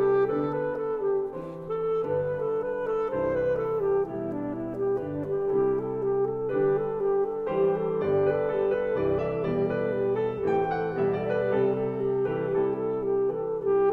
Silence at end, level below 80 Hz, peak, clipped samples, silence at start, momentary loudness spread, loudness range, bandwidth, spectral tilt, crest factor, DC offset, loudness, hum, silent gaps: 0 s; -54 dBFS; -14 dBFS; under 0.1%; 0 s; 4 LU; 2 LU; 4.5 kHz; -9.5 dB/octave; 14 dB; under 0.1%; -27 LUFS; none; none